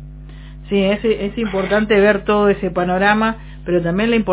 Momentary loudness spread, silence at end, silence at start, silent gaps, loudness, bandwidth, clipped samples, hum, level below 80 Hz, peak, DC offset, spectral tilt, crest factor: 17 LU; 0 s; 0 s; none; -16 LUFS; 4 kHz; under 0.1%; none; -36 dBFS; 0 dBFS; under 0.1%; -10 dB/octave; 16 dB